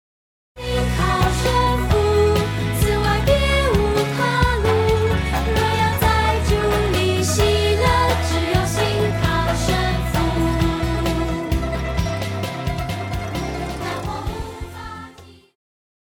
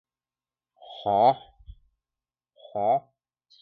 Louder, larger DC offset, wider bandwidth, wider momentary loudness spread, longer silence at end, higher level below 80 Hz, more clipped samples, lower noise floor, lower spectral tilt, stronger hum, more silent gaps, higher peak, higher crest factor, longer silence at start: first, -19 LUFS vs -25 LUFS; neither; first, 19 kHz vs 4.8 kHz; second, 9 LU vs 15 LU; about the same, 0.75 s vs 0.65 s; first, -26 dBFS vs -58 dBFS; neither; second, -43 dBFS vs under -90 dBFS; second, -5.5 dB/octave vs -8.5 dB/octave; neither; neither; first, -4 dBFS vs -8 dBFS; about the same, 16 dB vs 20 dB; second, 0.55 s vs 0.9 s